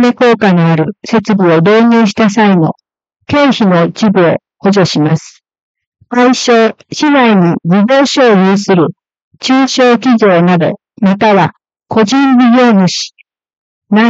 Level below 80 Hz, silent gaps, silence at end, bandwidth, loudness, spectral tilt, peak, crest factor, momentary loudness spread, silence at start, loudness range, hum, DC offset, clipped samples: -54 dBFS; 5.61-5.75 s, 5.87-5.92 s, 9.24-9.31 s, 13.57-13.82 s; 0 s; 8 kHz; -9 LUFS; -6 dB/octave; 0 dBFS; 8 dB; 7 LU; 0 s; 2 LU; none; under 0.1%; under 0.1%